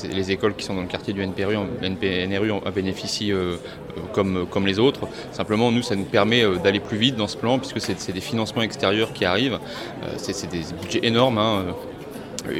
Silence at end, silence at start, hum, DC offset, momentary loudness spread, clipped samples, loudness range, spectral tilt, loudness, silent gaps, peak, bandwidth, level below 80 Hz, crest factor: 0 s; 0 s; none; under 0.1%; 12 LU; under 0.1%; 4 LU; -5 dB/octave; -23 LUFS; none; -2 dBFS; 16 kHz; -52 dBFS; 22 dB